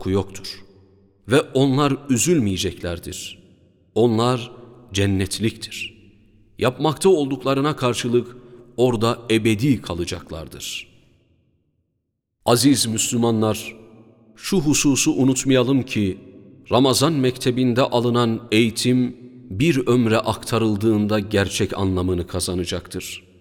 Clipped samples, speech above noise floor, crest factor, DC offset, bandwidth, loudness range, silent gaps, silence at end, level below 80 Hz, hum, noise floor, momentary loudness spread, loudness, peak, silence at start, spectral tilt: under 0.1%; 55 dB; 18 dB; under 0.1%; 18 kHz; 4 LU; none; 0.2 s; -48 dBFS; none; -75 dBFS; 14 LU; -20 LUFS; -2 dBFS; 0 s; -5 dB/octave